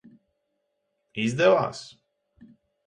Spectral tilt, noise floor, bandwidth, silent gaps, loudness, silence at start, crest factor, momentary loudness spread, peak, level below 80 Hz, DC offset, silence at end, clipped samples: -5.5 dB/octave; -77 dBFS; 10.5 kHz; none; -23 LUFS; 1.15 s; 20 dB; 21 LU; -8 dBFS; -68 dBFS; under 0.1%; 0.4 s; under 0.1%